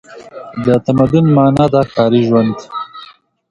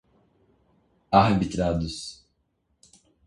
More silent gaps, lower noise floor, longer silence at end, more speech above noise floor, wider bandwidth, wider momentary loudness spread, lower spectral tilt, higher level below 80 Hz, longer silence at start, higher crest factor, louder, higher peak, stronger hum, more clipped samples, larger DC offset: neither; second, -41 dBFS vs -72 dBFS; second, 0.45 s vs 1.1 s; second, 29 dB vs 50 dB; about the same, 11 kHz vs 11.5 kHz; about the same, 18 LU vs 16 LU; first, -8.5 dB/octave vs -6.5 dB/octave; about the same, -44 dBFS vs -46 dBFS; second, 0.1 s vs 1.1 s; second, 14 dB vs 24 dB; first, -12 LUFS vs -24 LUFS; first, 0 dBFS vs -4 dBFS; neither; neither; neither